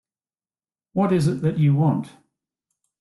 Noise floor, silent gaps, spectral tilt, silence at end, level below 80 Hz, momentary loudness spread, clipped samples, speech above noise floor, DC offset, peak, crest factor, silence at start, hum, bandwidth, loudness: under -90 dBFS; none; -8.5 dB/octave; 0.9 s; -58 dBFS; 10 LU; under 0.1%; over 70 dB; under 0.1%; -8 dBFS; 14 dB; 0.95 s; none; 12 kHz; -21 LUFS